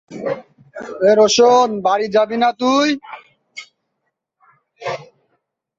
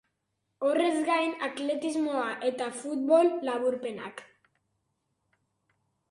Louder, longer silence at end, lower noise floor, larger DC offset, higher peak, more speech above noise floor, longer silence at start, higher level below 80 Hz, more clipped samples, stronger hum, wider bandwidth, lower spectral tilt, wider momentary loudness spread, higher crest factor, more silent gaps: first, -15 LUFS vs -28 LUFS; second, 0.75 s vs 1.85 s; second, -74 dBFS vs -80 dBFS; neither; first, -2 dBFS vs -10 dBFS; first, 59 dB vs 52 dB; second, 0.1 s vs 0.6 s; first, -64 dBFS vs -80 dBFS; neither; neither; second, 7.8 kHz vs 11.5 kHz; about the same, -3.5 dB/octave vs -3.5 dB/octave; first, 24 LU vs 12 LU; about the same, 16 dB vs 20 dB; neither